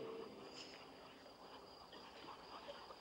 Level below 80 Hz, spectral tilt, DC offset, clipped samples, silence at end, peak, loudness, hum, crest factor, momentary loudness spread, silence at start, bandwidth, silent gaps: -80 dBFS; -3.5 dB/octave; under 0.1%; under 0.1%; 0 s; -40 dBFS; -56 LUFS; none; 16 dB; 5 LU; 0 s; 16 kHz; none